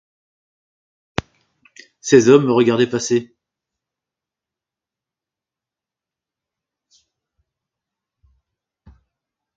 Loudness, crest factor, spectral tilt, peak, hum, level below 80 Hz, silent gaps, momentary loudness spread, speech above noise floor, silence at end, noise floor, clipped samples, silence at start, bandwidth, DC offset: -16 LUFS; 22 dB; -5 dB/octave; 0 dBFS; none; -54 dBFS; none; 17 LU; 74 dB; 6.35 s; -88 dBFS; under 0.1%; 2.05 s; 7.8 kHz; under 0.1%